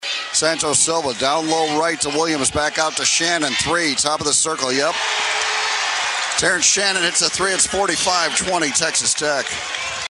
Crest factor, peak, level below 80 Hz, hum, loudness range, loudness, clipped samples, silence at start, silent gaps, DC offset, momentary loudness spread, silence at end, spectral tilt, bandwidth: 20 dB; 0 dBFS; -50 dBFS; none; 1 LU; -17 LUFS; under 0.1%; 0 s; none; under 0.1%; 4 LU; 0 s; -1 dB/octave; 11.5 kHz